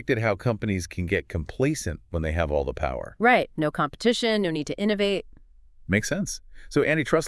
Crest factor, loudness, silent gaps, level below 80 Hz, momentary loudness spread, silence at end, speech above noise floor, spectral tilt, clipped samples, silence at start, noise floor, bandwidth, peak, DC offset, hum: 20 dB; -25 LUFS; none; -42 dBFS; 9 LU; 0 s; 26 dB; -5 dB/octave; under 0.1%; 0 s; -50 dBFS; 12 kHz; -6 dBFS; under 0.1%; none